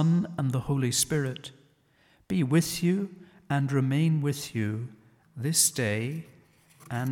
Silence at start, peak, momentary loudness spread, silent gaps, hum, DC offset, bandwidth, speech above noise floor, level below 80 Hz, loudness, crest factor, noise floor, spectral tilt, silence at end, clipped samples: 0 s; -10 dBFS; 13 LU; none; none; under 0.1%; 18 kHz; 37 dB; -60 dBFS; -27 LUFS; 18 dB; -64 dBFS; -4.5 dB/octave; 0 s; under 0.1%